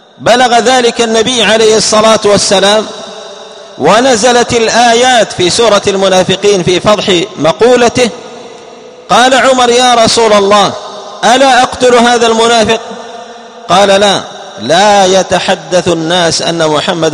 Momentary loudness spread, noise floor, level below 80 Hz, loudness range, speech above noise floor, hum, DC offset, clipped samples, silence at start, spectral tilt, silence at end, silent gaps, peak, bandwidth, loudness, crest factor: 15 LU; -30 dBFS; -42 dBFS; 2 LU; 24 dB; none; 0.2%; 1%; 0.2 s; -3 dB/octave; 0 s; none; 0 dBFS; 14 kHz; -7 LUFS; 8 dB